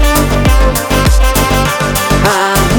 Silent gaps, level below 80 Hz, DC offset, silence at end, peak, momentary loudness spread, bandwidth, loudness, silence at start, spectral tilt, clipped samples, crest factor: none; -14 dBFS; under 0.1%; 0 s; 0 dBFS; 2 LU; over 20 kHz; -10 LUFS; 0 s; -4.5 dB/octave; under 0.1%; 10 dB